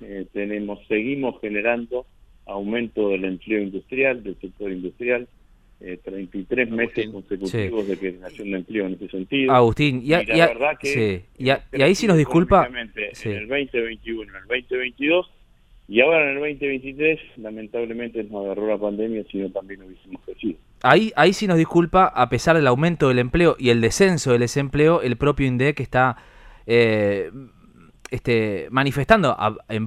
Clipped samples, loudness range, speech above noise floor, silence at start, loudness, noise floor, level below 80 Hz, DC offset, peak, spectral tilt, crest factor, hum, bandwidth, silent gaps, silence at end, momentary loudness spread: under 0.1%; 8 LU; 31 dB; 0 s; -21 LUFS; -52 dBFS; -44 dBFS; under 0.1%; 0 dBFS; -6 dB/octave; 22 dB; none; 14 kHz; none; 0 s; 15 LU